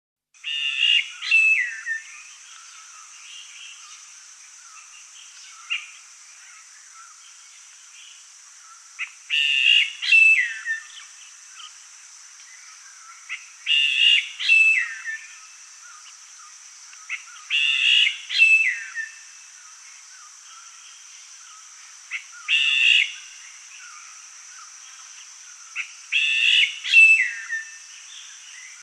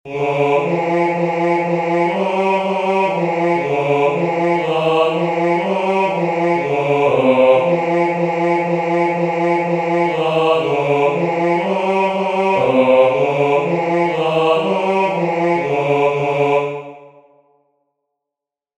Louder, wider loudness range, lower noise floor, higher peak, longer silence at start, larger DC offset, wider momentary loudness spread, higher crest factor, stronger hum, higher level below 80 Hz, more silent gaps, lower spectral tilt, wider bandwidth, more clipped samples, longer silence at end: about the same, -17 LUFS vs -16 LUFS; first, 19 LU vs 2 LU; second, -47 dBFS vs -85 dBFS; about the same, -4 dBFS vs -2 dBFS; first, 0.45 s vs 0.05 s; neither; first, 27 LU vs 4 LU; about the same, 20 dB vs 16 dB; neither; second, under -90 dBFS vs -60 dBFS; neither; second, 10 dB/octave vs -7 dB/octave; first, 12.5 kHz vs 9.2 kHz; neither; second, 0.1 s vs 1.7 s